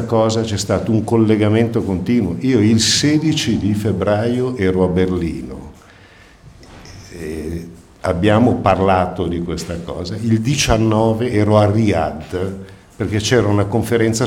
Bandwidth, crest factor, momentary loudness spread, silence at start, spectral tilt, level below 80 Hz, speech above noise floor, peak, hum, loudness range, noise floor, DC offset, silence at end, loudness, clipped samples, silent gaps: 16 kHz; 16 dB; 13 LU; 0 s; -5.5 dB/octave; -38 dBFS; 29 dB; 0 dBFS; none; 6 LU; -44 dBFS; under 0.1%; 0 s; -16 LUFS; under 0.1%; none